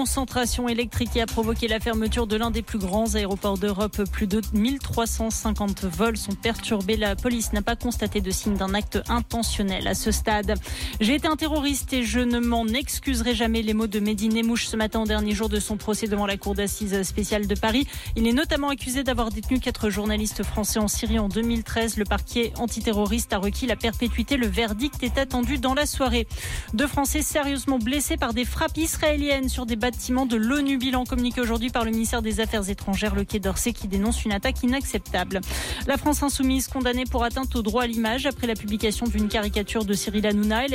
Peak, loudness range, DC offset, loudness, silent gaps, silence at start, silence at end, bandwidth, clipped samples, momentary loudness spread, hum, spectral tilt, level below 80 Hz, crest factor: -12 dBFS; 1 LU; under 0.1%; -25 LUFS; none; 0 s; 0 s; 17 kHz; under 0.1%; 4 LU; none; -4 dB/octave; -34 dBFS; 12 dB